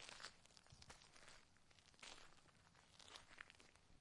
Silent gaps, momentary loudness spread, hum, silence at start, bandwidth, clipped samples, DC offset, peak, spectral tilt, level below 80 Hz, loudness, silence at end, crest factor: none; 9 LU; none; 0 s; 11 kHz; under 0.1%; under 0.1%; -36 dBFS; -1.5 dB/octave; -78 dBFS; -63 LUFS; 0 s; 28 dB